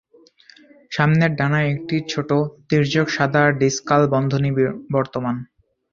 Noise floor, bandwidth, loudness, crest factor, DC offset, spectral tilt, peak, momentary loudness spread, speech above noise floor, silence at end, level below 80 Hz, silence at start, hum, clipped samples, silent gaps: -51 dBFS; 7.4 kHz; -19 LUFS; 18 dB; under 0.1%; -6 dB/octave; -2 dBFS; 7 LU; 32 dB; 0.5 s; -54 dBFS; 0.9 s; none; under 0.1%; none